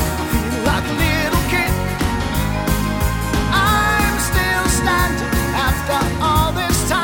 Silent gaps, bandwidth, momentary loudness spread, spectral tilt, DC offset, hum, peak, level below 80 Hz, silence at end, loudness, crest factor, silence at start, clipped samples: none; 20 kHz; 5 LU; -4.5 dB/octave; under 0.1%; none; -2 dBFS; -24 dBFS; 0 s; -17 LUFS; 14 dB; 0 s; under 0.1%